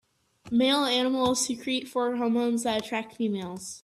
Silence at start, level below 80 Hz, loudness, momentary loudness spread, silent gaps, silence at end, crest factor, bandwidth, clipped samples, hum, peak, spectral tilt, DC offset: 0.45 s; -66 dBFS; -27 LUFS; 8 LU; none; 0.05 s; 14 dB; 13.5 kHz; under 0.1%; none; -12 dBFS; -3 dB/octave; under 0.1%